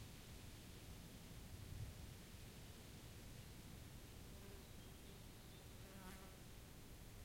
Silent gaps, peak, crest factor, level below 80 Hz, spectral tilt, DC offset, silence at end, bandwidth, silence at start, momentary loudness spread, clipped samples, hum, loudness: none; -40 dBFS; 16 dB; -62 dBFS; -4.5 dB/octave; under 0.1%; 0 s; 16.5 kHz; 0 s; 4 LU; under 0.1%; none; -58 LUFS